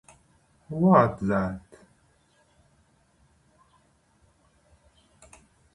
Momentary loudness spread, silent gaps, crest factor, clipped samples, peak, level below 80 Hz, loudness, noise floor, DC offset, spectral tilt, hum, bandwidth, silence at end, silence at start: 18 LU; none; 26 dB; under 0.1%; -4 dBFS; -56 dBFS; -23 LUFS; -64 dBFS; under 0.1%; -9 dB/octave; none; 10.5 kHz; 4.15 s; 0.7 s